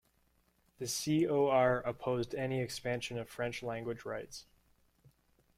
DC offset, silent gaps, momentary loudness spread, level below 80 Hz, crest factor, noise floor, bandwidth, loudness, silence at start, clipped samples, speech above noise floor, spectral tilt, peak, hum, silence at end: under 0.1%; none; 13 LU; -66 dBFS; 20 dB; -73 dBFS; 16 kHz; -35 LUFS; 0.8 s; under 0.1%; 39 dB; -5 dB/octave; -16 dBFS; none; 1.15 s